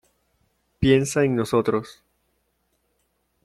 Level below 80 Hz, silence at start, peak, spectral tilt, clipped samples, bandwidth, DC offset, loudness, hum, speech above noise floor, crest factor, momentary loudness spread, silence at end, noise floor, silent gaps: -50 dBFS; 0.8 s; -4 dBFS; -6 dB/octave; under 0.1%; 14 kHz; under 0.1%; -21 LUFS; none; 50 dB; 20 dB; 9 LU; 1.55 s; -71 dBFS; none